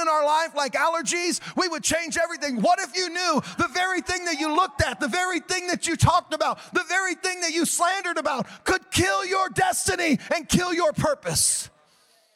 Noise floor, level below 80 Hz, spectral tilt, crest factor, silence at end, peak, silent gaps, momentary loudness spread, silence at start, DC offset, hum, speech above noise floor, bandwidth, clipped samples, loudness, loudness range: -61 dBFS; -50 dBFS; -3 dB/octave; 18 dB; 0.7 s; -6 dBFS; none; 5 LU; 0 s; under 0.1%; none; 37 dB; 16.5 kHz; under 0.1%; -23 LUFS; 1 LU